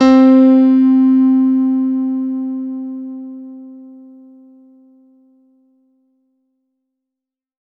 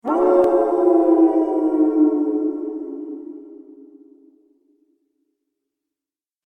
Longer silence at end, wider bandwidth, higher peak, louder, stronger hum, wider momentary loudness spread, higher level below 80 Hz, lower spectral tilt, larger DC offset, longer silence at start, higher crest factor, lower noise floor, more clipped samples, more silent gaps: first, 3.8 s vs 2.85 s; first, 6 kHz vs 3.1 kHz; first, 0 dBFS vs -4 dBFS; first, -12 LUFS vs -17 LUFS; neither; first, 23 LU vs 18 LU; about the same, -60 dBFS vs -62 dBFS; second, -6.5 dB/octave vs -8 dB/octave; neither; about the same, 0 s vs 0.05 s; about the same, 16 dB vs 18 dB; second, -84 dBFS vs under -90 dBFS; neither; neither